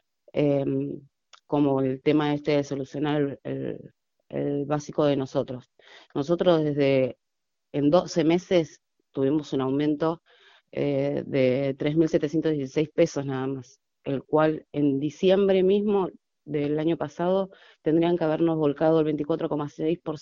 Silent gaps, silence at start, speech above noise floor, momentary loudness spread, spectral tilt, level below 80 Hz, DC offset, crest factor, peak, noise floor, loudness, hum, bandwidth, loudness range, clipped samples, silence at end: none; 0.35 s; 61 dB; 11 LU; -7 dB/octave; -62 dBFS; under 0.1%; 20 dB; -6 dBFS; -86 dBFS; -25 LUFS; none; 7.4 kHz; 3 LU; under 0.1%; 0 s